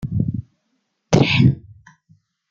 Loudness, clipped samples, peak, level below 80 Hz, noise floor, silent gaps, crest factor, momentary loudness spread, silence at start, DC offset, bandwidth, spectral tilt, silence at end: -18 LUFS; under 0.1%; -2 dBFS; -44 dBFS; -71 dBFS; none; 18 dB; 16 LU; 0 s; under 0.1%; 7.4 kHz; -6.5 dB/octave; 0.9 s